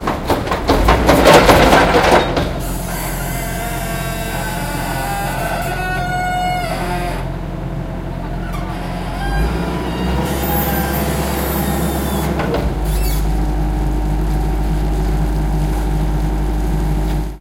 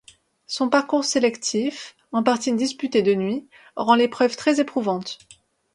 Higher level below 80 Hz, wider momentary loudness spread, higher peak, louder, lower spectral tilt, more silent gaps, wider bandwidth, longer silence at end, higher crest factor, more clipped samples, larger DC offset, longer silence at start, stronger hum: first, -22 dBFS vs -68 dBFS; about the same, 13 LU vs 12 LU; about the same, 0 dBFS vs -2 dBFS; first, -17 LUFS vs -22 LUFS; about the same, -5 dB/octave vs -4 dB/octave; neither; first, 16.5 kHz vs 11.5 kHz; second, 0 s vs 0.6 s; about the same, 16 dB vs 20 dB; neither; neither; second, 0 s vs 0.5 s; neither